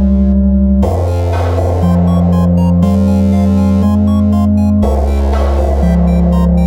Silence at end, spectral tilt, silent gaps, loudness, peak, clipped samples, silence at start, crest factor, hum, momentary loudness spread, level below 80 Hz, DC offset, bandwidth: 0 s; -9.5 dB/octave; none; -11 LUFS; 0 dBFS; under 0.1%; 0 s; 10 dB; none; 3 LU; -16 dBFS; under 0.1%; 10.5 kHz